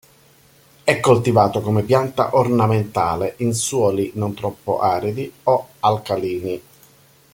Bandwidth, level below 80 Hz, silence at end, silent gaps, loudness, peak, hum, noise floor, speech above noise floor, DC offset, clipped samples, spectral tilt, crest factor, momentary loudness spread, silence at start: 17 kHz; -54 dBFS; 0.75 s; none; -19 LUFS; 0 dBFS; none; -52 dBFS; 34 dB; under 0.1%; under 0.1%; -5.5 dB/octave; 18 dB; 9 LU; 0.85 s